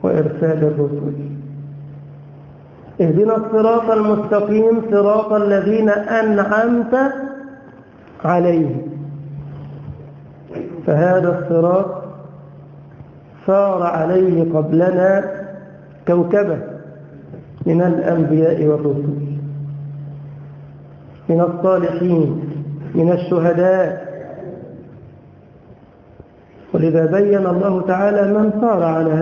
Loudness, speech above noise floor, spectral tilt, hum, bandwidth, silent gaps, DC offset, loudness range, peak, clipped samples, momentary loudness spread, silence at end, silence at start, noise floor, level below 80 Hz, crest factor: -16 LUFS; 29 dB; -10 dB/octave; none; 7 kHz; none; under 0.1%; 6 LU; -2 dBFS; under 0.1%; 19 LU; 0 s; 0 s; -44 dBFS; -52 dBFS; 16 dB